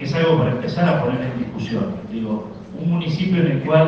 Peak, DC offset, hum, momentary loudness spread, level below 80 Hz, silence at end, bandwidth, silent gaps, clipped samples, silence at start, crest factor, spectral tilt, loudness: -2 dBFS; under 0.1%; none; 9 LU; -50 dBFS; 0 s; 6.8 kHz; none; under 0.1%; 0 s; 18 dB; -8.5 dB/octave; -21 LUFS